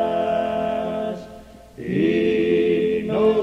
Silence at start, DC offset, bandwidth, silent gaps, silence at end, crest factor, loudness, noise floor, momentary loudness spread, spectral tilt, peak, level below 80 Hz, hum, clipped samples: 0 s; under 0.1%; 8.6 kHz; none; 0 s; 14 dB; -21 LUFS; -42 dBFS; 12 LU; -7.5 dB/octave; -8 dBFS; -52 dBFS; none; under 0.1%